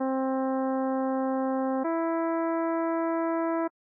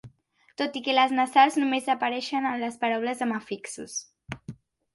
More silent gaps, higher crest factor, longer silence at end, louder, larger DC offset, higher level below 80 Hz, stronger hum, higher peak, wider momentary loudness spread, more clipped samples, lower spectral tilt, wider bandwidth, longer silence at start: neither; second, 6 dB vs 20 dB; about the same, 0.3 s vs 0.4 s; about the same, -28 LUFS vs -26 LUFS; neither; second, under -90 dBFS vs -66 dBFS; neither; second, -22 dBFS vs -6 dBFS; second, 0 LU vs 20 LU; neither; first, -8.5 dB/octave vs -3 dB/octave; second, 2.5 kHz vs 11.5 kHz; about the same, 0 s vs 0.05 s